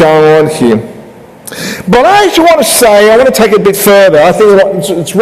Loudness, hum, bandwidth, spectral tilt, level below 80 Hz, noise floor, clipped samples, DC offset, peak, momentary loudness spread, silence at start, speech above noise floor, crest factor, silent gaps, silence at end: -5 LUFS; none; 16 kHz; -4 dB/octave; -38 dBFS; -31 dBFS; 0.9%; under 0.1%; 0 dBFS; 11 LU; 0 s; 25 dB; 6 dB; none; 0 s